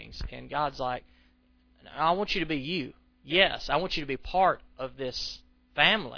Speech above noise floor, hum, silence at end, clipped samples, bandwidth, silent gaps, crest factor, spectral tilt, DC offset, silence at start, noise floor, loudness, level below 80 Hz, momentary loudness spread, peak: 35 dB; none; 0 s; under 0.1%; 5.4 kHz; none; 22 dB; -4.5 dB/octave; under 0.1%; 0 s; -64 dBFS; -28 LUFS; -48 dBFS; 17 LU; -8 dBFS